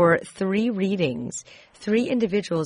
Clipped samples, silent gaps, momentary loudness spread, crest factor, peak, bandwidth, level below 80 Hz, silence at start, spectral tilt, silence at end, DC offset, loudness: under 0.1%; none; 11 LU; 16 dB; -8 dBFS; 10.5 kHz; -60 dBFS; 0 s; -6 dB/octave; 0 s; under 0.1%; -24 LUFS